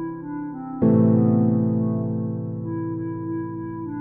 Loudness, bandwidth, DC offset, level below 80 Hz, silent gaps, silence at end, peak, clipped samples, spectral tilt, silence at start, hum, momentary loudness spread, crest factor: -23 LUFS; 2.4 kHz; under 0.1%; -54 dBFS; none; 0 s; -8 dBFS; under 0.1%; -15 dB/octave; 0 s; none; 14 LU; 14 dB